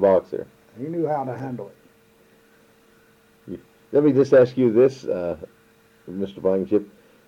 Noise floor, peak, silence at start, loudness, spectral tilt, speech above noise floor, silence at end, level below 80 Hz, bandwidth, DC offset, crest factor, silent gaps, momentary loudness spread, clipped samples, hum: -56 dBFS; -6 dBFS; 0 s; -21 LUFS; -8.5 dB/octave; 36 dB; 0.4 s; -62 dBFS; 7.6 kHz; under 0.1%; 16 dB; none; 23 LU; under 0.1%; none